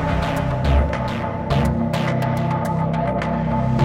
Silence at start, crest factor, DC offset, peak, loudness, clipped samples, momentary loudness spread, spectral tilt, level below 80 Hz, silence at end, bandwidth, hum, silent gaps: 0 s; 14 dB; under 0.1%; -4 dBFS; -21 LUFS; under 0.1%; 3 LU; -7.5 dB/octave; -28 dBFS; 0 s; 15.5 kHz; none; none